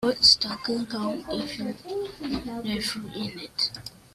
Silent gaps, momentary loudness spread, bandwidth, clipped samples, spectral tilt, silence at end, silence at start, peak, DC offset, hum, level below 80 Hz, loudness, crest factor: none; 16 LU; 15.5 kHz; under 0.1%; -3 dB/octave; 0.25 s; 0 s; -4 dBFS; under 0.1%; none; -54 dBFS; -26 LUFS; 22 dB